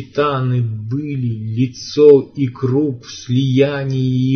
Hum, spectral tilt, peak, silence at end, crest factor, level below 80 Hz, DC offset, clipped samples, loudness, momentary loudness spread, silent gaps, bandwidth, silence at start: none; -7.5 dB/octave; 0 dBFS; 0 s; 16 dB; -56 dBFS; under 0.1%; under 0.1%; -16 LUFS; 12 LU; none; 6.6 kHz; 0 s